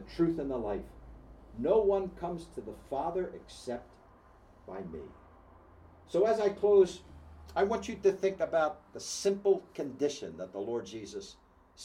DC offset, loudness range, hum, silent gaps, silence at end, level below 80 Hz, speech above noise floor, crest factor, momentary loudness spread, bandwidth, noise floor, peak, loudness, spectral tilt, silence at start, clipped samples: under 0.1%; 11 LU; none; none; 0 s; -56 dBFS; 27 dB; 18 dB; 18 LU; 11.5 kHz; -59 dBFS; -14 dBFS; -32 LUFS; -5.5 dB/octave; 0 s; under 0.1%